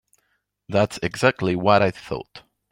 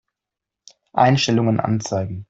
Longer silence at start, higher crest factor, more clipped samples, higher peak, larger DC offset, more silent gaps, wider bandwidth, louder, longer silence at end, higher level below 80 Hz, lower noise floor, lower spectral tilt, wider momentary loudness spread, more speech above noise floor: second, 0.7 s vs 0.95 s; about the same, 20 dB vs 18 dB; neither; about the same, -2 dBFS vs -4 dBFS; neither; neither; first, 16.5 kHz vs 8 kHz; about the same, -21 LUFS vs -19 LUFS; first, 0.3 s vs 0.05 s; about the same, -54 dBFS vs -56 dBFS; second, -71 dBFS vs -86 dBFS; about the same, -6 dB/octave vs -5.5 dB/octave; first, 14 LU vs 9 LU; second, 50 dB vs 67 dB